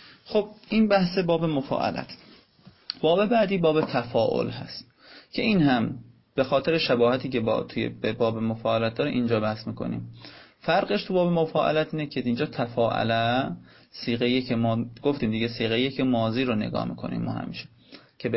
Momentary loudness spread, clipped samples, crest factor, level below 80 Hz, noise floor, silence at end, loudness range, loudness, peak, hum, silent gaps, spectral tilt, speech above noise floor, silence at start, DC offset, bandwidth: 13 LU; under 0.1%; 16 dB; -56 dBFS; -55 dBFS; 0 s; 2 LU; -25 LUFS; -10 dBFS; none; none; -10 dB/octave; 30 dB; 0 s; under 0.1%; 5.8 kHz